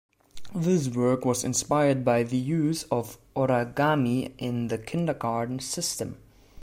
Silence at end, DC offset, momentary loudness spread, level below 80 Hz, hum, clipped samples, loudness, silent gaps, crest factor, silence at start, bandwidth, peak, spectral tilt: 0 s; under 0.1%; 7 LU; -58 dBFS; none; under 0.1%; -26 LUFS; none; 16 dB; 0.35 s; 16 kHz; -10 dBFS; -5.5 dB/octave